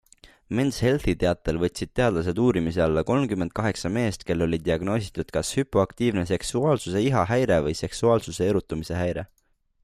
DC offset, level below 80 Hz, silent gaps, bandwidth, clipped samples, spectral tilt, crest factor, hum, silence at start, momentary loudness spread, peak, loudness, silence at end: under 0.1%; -44 dBFS; none; 15 kHz; under 0.1%; -6 dB/octave; 16 dB; none; 0.25 s; 5 LU; -8 dBFS; -25 LUFS; 0.6 s